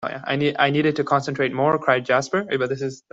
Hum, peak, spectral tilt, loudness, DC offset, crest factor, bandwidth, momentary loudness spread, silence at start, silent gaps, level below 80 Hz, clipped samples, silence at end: none; -4 dBFS; -5.5 dB/octave; -21 LUFS; under 0.1%; 18 dB; 8 kHz; 6 LU; 0 s; none; -62 dBFS; under 0.1%; 0.15 s